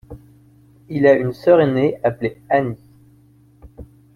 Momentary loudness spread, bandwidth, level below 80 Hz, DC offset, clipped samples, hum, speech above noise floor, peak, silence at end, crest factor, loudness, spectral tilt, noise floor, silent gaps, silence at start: 14 LU; 6.6 kHz; -50 dBFS; under 0.1%; under 0.1%; none; 35 dB; -2 dBFS; 0.3 s; 18 dB; -17 LUFS; -8.5 dB/octave; -51 dBFS; none; 0.1 s